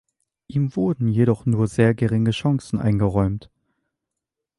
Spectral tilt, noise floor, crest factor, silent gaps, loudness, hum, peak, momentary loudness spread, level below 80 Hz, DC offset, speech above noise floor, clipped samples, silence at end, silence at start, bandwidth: -8 dB/octave; -84 dBFS; 18 dB; none; -21 LUFS; none; -4 dBFS; 6 LU; -44 dBFS; under 0.1%; 64 dB; under 0.1%; 1.15 s; 0.5 s; 11.5 kHz